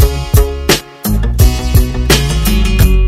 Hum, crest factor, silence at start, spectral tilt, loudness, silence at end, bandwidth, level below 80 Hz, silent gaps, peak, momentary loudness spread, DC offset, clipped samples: none; 10 dB; 0 s; -4.5 dB/octave; -12 LUFS; 0 s; 16.5 kHz; -12 dBFS; none; 0 dBFS; 3 LU; under 0.1%; 0.8%